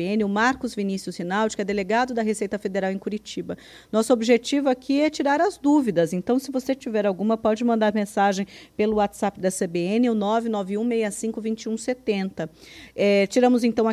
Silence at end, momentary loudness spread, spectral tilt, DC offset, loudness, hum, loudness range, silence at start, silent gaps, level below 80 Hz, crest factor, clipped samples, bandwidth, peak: 0 s; 9 LU; -5 dB/octave; under 0.1%; -23 LUFS; none; 3 LU; 0 s; none; -58 dBFS; 18 dB; under 0.1%; 14.5 kHz; -6 dBFS